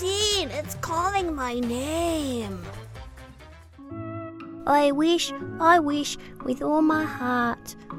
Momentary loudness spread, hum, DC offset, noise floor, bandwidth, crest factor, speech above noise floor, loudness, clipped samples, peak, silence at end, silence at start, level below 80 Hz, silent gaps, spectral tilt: 18 LU; none; under 0.1%; -47 dBFS; 17.5 kHz; 20 dB; 22 dB; -24 LUFS; under 0.1%; -6 dBFS; 0 s; 0 s; -48 dBFS; none; -4 dB/octave